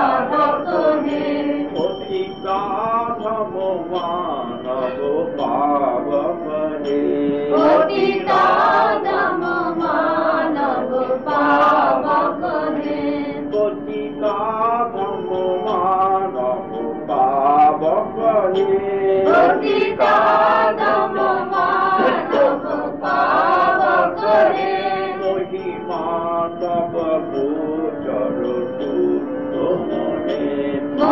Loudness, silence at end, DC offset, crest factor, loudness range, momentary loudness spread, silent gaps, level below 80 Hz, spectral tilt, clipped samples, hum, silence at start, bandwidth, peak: -18 LUFS; 0 s; 0.4%; 12 dB; 6 LU; 8 LU; none; -56 dBFS; -7 dB/octave; under 0.1%; none; 0 s; 7.2 kHz; -6 dBFS